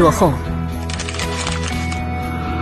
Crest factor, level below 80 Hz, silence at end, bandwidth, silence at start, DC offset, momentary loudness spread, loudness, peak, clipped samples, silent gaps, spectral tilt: 18 dB; -28 dBFS; 0 s; 13 kHz; 0 s; under 0.1%; 7 LU; -21 LUFS; 0 dBFS; under 0.1%; none; -5 dB/octave